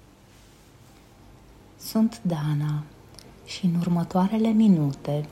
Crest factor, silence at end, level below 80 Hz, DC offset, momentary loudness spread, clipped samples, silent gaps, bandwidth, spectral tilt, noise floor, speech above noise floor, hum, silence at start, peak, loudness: 16 dB; 0 s; -56 dBFS; under 0.1%; 17 LU; under 0.1%; none; 14 kHz; -7.5 dB/octave; -52 dBFS; 29 dB; none; 1.8 s; -10 dBFS; -24 LUFS